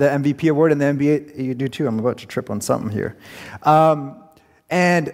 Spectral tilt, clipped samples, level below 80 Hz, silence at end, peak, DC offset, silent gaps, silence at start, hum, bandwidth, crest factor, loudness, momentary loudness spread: -6.5 dB/octave; under 0.1%; -58 dBFS; 0 s; -4 dBFS; under 0.1%; none; 0 s; none; 16 kHz; 16 dB; -19 LUFS; 12 LU